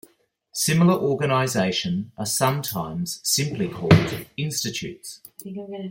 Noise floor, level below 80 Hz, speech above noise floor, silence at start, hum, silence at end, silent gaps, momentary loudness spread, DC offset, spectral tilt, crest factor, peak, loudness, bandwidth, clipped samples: -61 dBFS; -54 dBFS; 38 dB; 0.55 s; none; 0 s; none; 16 LU; under 0.1%; -4.5 dB/octave; 22 dB; -2 dBFS; -22 LUFS; 17 kHz; under 0.1%